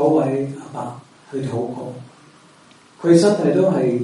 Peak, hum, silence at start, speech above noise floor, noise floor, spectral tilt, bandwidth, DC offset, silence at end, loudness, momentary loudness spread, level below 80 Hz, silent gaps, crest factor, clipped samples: -2 dBFS; none; 0 s; 31 dB; -49 dBFS; -7 dB/octave; 11.5 kHz; under 0.1%; 0 s; -19 LUFS; 19 LU; -64 dBFS; none; 18 dB; under 0.1%